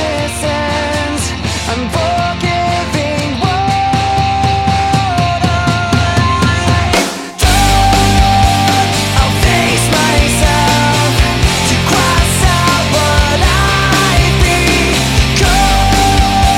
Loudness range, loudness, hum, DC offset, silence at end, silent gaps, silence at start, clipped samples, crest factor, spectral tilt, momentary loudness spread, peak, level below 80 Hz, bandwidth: 4 LU; -11 LUFS; none; under 0.1%; 0 s; none; 0 s; under 0.1%; 10 dB; -4 dB/octave; 5 LU; 0 dBFS; -18 dBFS; 16.5 kHz